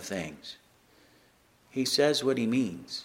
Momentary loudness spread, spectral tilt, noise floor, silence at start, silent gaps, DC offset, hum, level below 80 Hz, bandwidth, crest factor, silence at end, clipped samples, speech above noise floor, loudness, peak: 20 LU; -4 dB/octave; -63 dBFS; 0 s; none; under 0.1%; none; -68 dBFS; 16 kHz; 20 dB; 0 s; under 0.1%; 34 dB; -28 LUFS; -12 dBFS